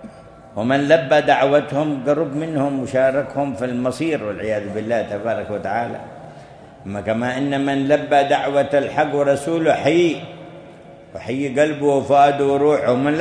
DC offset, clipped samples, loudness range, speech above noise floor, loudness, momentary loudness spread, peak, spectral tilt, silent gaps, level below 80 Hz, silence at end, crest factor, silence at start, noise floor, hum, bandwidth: under 0.1%; under 0.1%; 6 LU; 23 dB; -19 LUFS; 13 LU; 0 dBFS; -6 dB/octave; none; -56 dBFS; 0 s; 18 dB; 0 s; -41 dBFS; none; 11 kHz